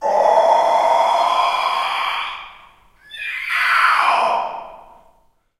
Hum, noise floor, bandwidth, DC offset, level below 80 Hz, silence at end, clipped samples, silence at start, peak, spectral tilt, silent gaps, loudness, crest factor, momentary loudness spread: none; -57 dBFS; 15.5 kHz; under 0.1%; -58 dBFS; 0.85 s; under 0.1%; 0 s; -2 dBFS; -0.5 dB/octave; none; -16 LUFS; 16 dB; 14 LU